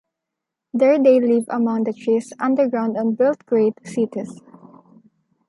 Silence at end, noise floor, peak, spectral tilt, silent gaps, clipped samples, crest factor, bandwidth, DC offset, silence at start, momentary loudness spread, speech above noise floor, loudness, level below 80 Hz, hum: 1.1 s; -83 dBFS; -4 dBFS; -7 dB/octave; none; under 0.1%; 16 dB; 11.5 kHz; under 0.1%; 0.75 s; 10 LU; 64 dB; -19 LUFS; -74 dBFS; none